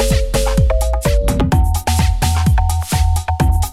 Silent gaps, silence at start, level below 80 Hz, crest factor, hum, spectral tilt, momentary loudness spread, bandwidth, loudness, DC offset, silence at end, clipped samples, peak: none; 0 s; -16 dBFS; 12 dB; none; -5.5 dB/octave; 2 LU; 16 kHz; -16 LUFS; under 0.1%; 0 s; under 0.1%; -2 dBFS